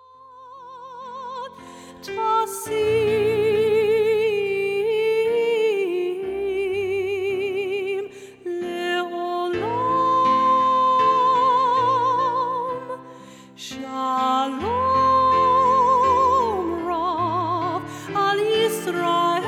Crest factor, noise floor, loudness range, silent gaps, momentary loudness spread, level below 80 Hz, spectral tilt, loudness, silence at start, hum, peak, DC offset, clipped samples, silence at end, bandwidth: 12 dB; -45 dBFS; 6 LU; none; 16 LU; -56 dBFS; -4.5 dB/octave; -21 LUFS; 0.3 s; none; -8 dBFS; under 0.1%; under 0.1%; 0 s; 16.5 kHz